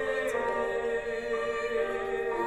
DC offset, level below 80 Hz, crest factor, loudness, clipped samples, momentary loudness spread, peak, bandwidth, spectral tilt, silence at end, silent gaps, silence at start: under 0.1%; -54 dBFS; 12 dB; -31 LUFS; under 0.1%; 2 LU; -18 dBFS; 14 kHz; -4 dB/octave; 0 s; none; 0 s